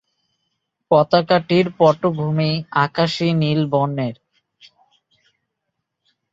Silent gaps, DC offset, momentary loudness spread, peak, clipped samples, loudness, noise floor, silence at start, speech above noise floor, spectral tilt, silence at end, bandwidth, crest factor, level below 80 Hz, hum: none; under 0.1%; 5 LU; -2 dBFS; under 0.1%; -18 LUFS; -78 dBFS; 0.9 s; 60 dB; -7.5 dB/octave; 2.2 s; 7.8 kHz; 18 dB; -60 dBFS; none